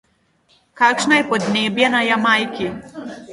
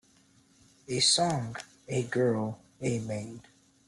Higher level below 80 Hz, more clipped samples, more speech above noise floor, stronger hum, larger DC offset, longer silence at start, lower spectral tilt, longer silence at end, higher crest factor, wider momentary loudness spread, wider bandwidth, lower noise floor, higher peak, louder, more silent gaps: first, -58 dBFS vs -66 dBFS; neither; first, 42 dB vs 34 dB; neither; neither; second, 0.75 s vs 0.9 s; about the same, -3.5 dB/octave vs -3.5 dB/octave; second, 0 s vs 0.45 s; about the same, 18 dB vs 20 dB; second, 15 LU vs 18 LU; about the same, 11.5 kHz vs 12 kHz; about the same, -60 dBFS vs -63 dBFS; first, 0 dBFS vs -12 dBFS; first, -16 LUFS vs -29 LUFS; neither